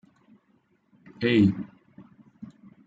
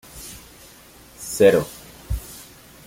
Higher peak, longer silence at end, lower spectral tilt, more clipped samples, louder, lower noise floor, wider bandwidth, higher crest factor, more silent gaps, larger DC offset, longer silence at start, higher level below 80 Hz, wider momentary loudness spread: second, -10 dBFS vs -2 dBFS; about the same, 0.4 s vs 0.5 s; first, -8.5 dB/octave vs -4.5 dB/octave; neither; second, -24 LUFS vs -20 LUFS; first, -67 dBFS vs -47 dBFS; second, 7.6 kHz vs 16.5 kHz; about the same, 20 dB vs 22 dB; neither; neither; first, 1.2 s vs 0.15 s; second, -66 dBFS vs -38 dBFS; about the same, 26 LU vs 25 LU